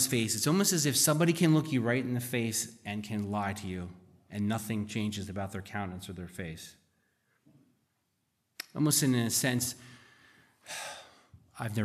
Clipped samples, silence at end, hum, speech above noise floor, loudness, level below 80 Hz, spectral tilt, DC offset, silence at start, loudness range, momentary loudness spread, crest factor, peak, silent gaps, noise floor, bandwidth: under 0.1%; 0 s; none; 48 dB; -30 LUFS; -68 dBFS; -4 dB/octave; under 0.1%; 0 s; 12 LU; 17 LU; 20 dB; -12 dBFS; none; -79 dBFS; 15 kHz